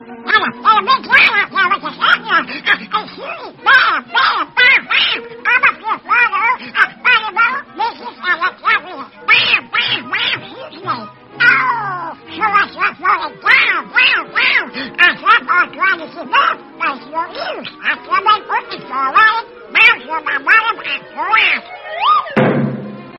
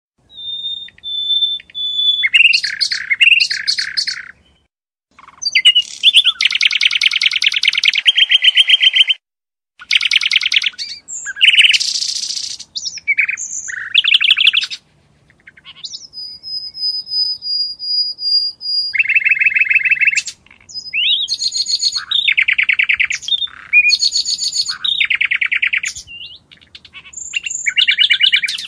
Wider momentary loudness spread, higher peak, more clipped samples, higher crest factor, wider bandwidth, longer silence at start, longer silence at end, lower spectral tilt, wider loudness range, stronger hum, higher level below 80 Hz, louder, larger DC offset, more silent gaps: second, 13 LU vs 16 LU; about the same, 0 dBFS vs 0 dBFS; neither; about the same, 14 dB vs 16 dB; second, 6 kHz vs 16 kHz; second, 0 s vs 0.35 s; about the same, 0 s vs 0 s; first, 0.5 dB/octave vs 4 dB/octave; about the same, 4 LU vs 6 LU; neither; about the same, -56 dBFS vs -60 dBFS; about the same, -13 LUFS vs -12 LUFS; neither; neither